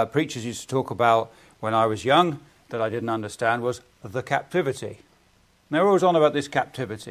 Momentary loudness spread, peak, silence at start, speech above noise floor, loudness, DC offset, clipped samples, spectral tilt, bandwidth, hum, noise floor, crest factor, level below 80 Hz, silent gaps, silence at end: 14 LU; -6 dBFS; 0 s; 37 dB; -24 LUFS; under 0.1%; under 0.1%; -5.5 dB/octave; 15.5 kHz; none; -60 dBFS; 18 dB; -60 dBFS; none; 0 s